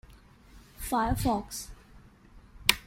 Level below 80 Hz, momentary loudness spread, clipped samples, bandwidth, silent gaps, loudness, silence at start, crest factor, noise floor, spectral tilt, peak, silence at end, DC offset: -44 dBFS; 14 LU; under 0.1%; 16.5 kHz; none; -30 LUFS; 0.1 s; 32 dB; -55 dBFS; -3 dB/octave; -2 dBFS; 0.05 s; under 0.1%